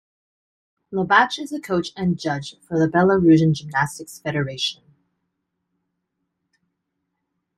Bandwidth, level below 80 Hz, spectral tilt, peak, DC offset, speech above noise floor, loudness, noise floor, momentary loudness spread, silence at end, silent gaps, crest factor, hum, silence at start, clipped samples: 13.5 kHz; -58 dBFS; -6 dB/octave; -2 dBFS; under 0.1%; 57 dB; -20 LUFS; -77 dBFS; 12 LU; 2.85 s; none; 20 dB; none; 0.9 s; under 0.1%